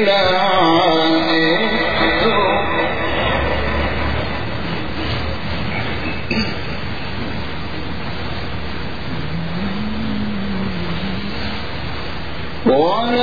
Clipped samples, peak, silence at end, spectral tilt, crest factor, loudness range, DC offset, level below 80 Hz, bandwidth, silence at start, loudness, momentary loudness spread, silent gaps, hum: under 0.1%; -2 dBFS; 0 s; -6.5 dB/octave; 16 dB; 9 LU; 6%; -32 dBFS; 5 kHz; 0 s; -19 LUFS; 12 LU; none; none